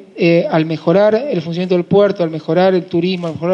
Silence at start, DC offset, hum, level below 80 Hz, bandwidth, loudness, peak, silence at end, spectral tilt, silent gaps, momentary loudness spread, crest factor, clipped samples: 0 s; under 0.1%; none; -62 dBFS; 6.8 kHz; -15 LUFS; -2 dBFS; 0 s; -8.5 dB/octave; none; 7 LU; 12 dB; under 0.1%